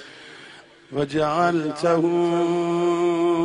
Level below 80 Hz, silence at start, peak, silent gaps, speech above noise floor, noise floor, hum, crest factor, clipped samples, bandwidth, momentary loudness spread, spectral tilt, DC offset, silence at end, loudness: -60 dBFS; 0 s; -8 dBFS; none; 25 dB; -46 dBFS; none; 14 dB; under 0.1%; 10.5 kHz; 21 LU; -6.5 dB/octave; under 0.1%; 0 s; -22 LUFS